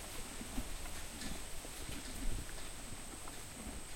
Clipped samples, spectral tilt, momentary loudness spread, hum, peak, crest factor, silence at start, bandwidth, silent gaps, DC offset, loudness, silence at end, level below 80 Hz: under 0.1%; -3 dB/octave; 3 LU; none; -24 dBFS; 18 dB; 0 s; 16.5 kHz; none; under 0.1%; -46 LUFS; 0 s; -48 dBFS